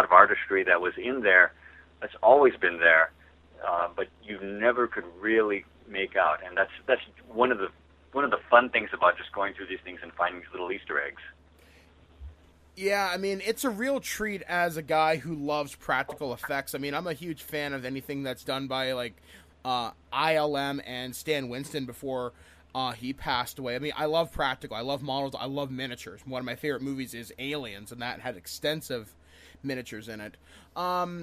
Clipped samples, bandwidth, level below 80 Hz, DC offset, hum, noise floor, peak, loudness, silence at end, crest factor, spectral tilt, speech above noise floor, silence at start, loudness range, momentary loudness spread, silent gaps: under 0.1%; 15.5 kHz; -58 dBFS; under 0.1%; none; -57 dBFS; -2 dBFS; -28 LUFS; 0 s; 28 dB; -4 dB/octave; 28 dB; 0 s; 10 LU; 16 LU; none